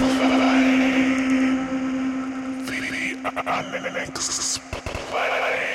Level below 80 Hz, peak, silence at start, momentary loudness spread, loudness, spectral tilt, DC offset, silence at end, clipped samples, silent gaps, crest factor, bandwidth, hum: -48 dBFS; -8 dBFS; 0 s; 10 LU; -22 LUFS; -3 dB/octave; under 0.1%; 0 s; under 0.1%; none; 14 dB; 13 kHz; none